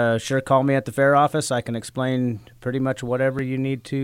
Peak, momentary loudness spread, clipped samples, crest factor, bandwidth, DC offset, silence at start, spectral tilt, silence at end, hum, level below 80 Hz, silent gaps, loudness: -6 dBFS; 8 LU; under 0.1%; 16 dB; 16 kHz; under 0.1%; 0 s; -6 dB/octave; 0 s; none; -56 dBFS; none; -22 LUFS